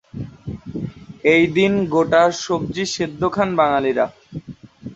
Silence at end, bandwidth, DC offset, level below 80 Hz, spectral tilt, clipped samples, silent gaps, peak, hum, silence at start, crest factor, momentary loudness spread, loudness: 0 s; 8.2 kHz; under 0.1%; -48 dBFS; -5.5 dB/octave; under 0.1%; none; -2 dBFS; none; 0.15 s; 18 dB; 19 LU; -18 LUFS